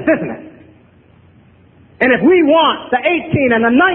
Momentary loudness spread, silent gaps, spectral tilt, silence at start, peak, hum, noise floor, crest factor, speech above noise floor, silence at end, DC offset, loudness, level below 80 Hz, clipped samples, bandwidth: 8 LU; none; -9 dB/octave; 0 s; 0 dBFS; none; -47 dBFS; 14 dB; 35 dB; 0 s; under 0.1%; -13 LUFS; -48 dBFS; under 0.1%; 4.2 kHz